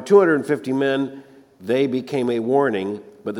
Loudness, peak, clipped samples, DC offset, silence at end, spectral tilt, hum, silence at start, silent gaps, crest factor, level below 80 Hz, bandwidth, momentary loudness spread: -21 LUFS; -2 dBFS; under 0.1%; under 0.1%; 0 s; -6.5 dB/octave; none; 0 s; none; 18 dB; -70 dBFS; 11.5 kHz; 13 LU